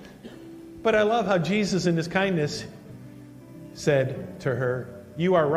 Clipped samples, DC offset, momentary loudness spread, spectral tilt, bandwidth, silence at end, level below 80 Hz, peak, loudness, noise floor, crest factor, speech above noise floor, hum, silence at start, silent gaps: under 0.1%; under 0.1%; 22 LU; -6 dB/octave; 14 kHz; 0 s; -58 dBFS; -8 dBFS; -25 LUFS; -44 dBFS; 18 dB; 21 dB; none; 0 s; none